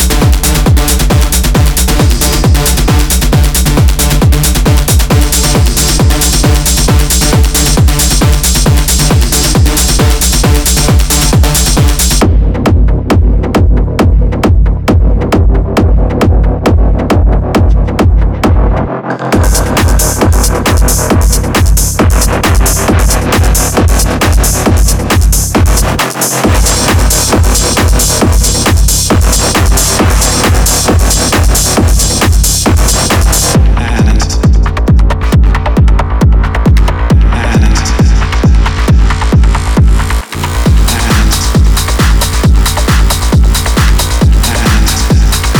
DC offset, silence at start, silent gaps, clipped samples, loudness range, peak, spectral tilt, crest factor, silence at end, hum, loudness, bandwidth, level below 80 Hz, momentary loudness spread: under 0.1%; 0 s; none; under 0.1%; 2 LU; 0 dBFS; -4.5 dB/octave; 6 dB; 0 s; none; -9 LUFS; over 20 kHz; -10 dBFS; 2 LU